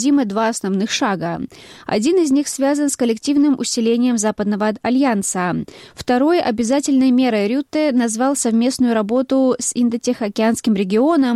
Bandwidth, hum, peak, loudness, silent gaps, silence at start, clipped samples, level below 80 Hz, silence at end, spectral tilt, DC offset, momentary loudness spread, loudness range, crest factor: 13.5 kHz; none; -6 dBFS; -17 LUFS; none; 0 s; under 0.1%; -56 dBFS; 0 s; -4.5 dB/octave; under 0.1%; 6 LU; 2 LU; 10 dB